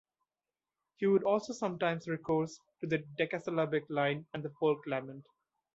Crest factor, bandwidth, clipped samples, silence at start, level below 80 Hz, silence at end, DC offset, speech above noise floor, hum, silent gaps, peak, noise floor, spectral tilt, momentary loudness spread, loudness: 18 dB; 8 kHz; under 0.1%; 1 s; -74 dBFS; 0.55 s; under 0.1%; over 57 dB; none; none; -18 dBFS; under -90 dBFS; -6.5 dB/octave; 10 LU; -34 LUFS